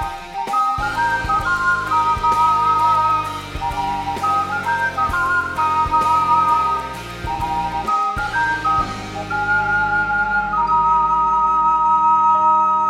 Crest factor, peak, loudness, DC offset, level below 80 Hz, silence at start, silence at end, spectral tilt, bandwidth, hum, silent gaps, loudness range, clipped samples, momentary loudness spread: 12 dB; -4 dBFS; -17 LUFS; under 0.1%; -38 dBFS; 0 s; 0 s; -4 dB/octave; 15.5 kHz; none; none; 3 LU; under 0.1%; 9 LU